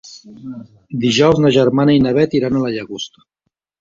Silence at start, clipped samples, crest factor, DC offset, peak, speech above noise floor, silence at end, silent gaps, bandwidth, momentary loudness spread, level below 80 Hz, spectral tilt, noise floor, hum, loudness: 0.05 s; under 0.1%; 14 dB; under 0.1%; -2 dBFS; 59 dB; 0.75 s; none; 7.6 kHz; 21 LU; -48 dBFS; -6 dB/octave; -74 dBFS; none; -14 LUFS